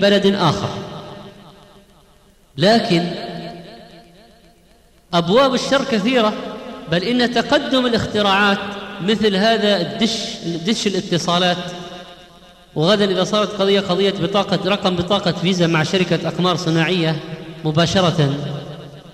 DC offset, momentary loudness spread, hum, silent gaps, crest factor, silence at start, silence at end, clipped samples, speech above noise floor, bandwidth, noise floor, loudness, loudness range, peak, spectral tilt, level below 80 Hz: under 0.1%; 15 LU; none; none; 14 dB; 0 s; 0 s; under 0.1%; 34 dB; 14 kHz; -51 dBFS; -17 LUFS; 5 LU; -4 dBFS; -5 dB/octave; -50 dBFS